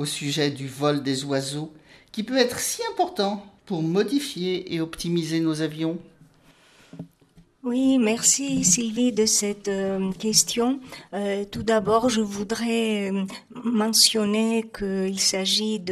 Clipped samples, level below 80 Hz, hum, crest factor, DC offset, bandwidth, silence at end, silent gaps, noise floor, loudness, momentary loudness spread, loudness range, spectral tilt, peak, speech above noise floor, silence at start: under 0.1%; -58 dBFS; none; 22 dB; under 0.1%; 14.5 kHz; 0 s; none; -56 dBFS; -23 LUFS; 13 LU; 6 LU; -3 dB/octave; -2 dBFS; 33 dB; 0 s